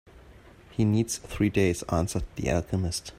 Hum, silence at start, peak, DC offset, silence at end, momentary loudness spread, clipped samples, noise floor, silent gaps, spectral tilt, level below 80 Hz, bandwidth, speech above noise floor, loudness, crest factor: none; 0.15 s; -10 dBFS; under 0.1%; 0 s; 6 LU; under 0.1%; -51 dBFS; none; -5.5 dB/octave; -44 dBFS; 16 kHz; 25 dB; -28 LUFS; 18 dB